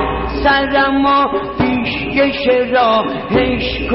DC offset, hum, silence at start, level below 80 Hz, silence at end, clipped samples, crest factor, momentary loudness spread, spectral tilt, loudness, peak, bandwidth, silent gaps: under 0.1%; none; 0 s; -30 dBFS; 0 s; under 0.1%; 12 dB; 5 LU; -3 dB/octave; -14 LUFS; -2 dBFS; 5.8 kHz; none